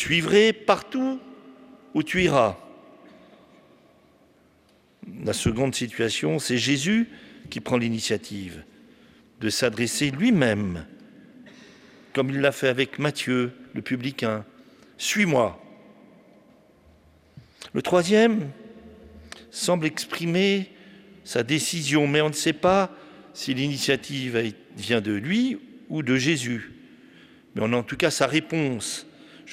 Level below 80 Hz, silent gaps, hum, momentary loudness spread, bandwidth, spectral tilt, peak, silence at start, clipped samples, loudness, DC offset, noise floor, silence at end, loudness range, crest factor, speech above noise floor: -58 dBFS; none; none; 16 LU; 16 kHz; -4.5 dB/octave; -4 dBFS; 0 s; under 0.1%; -24 LUFS; under 0.1%; -60 dBFS; 0 s; 4 LU; 20 dB; 36 dB